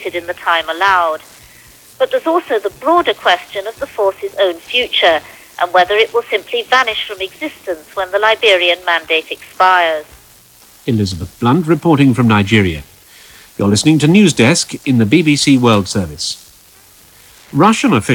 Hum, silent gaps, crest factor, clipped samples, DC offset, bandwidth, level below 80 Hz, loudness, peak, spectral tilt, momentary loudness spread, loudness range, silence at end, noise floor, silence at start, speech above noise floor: none; none; 14 dB; under 0.1%; under 0.1%; 19 kHz; -46 dBFS; -13 LUFS; 0 dBFS; -4.5 dB/octave; 12 LU; 4 LU; 0 s; -44 dBFS; 0 s; 31 dB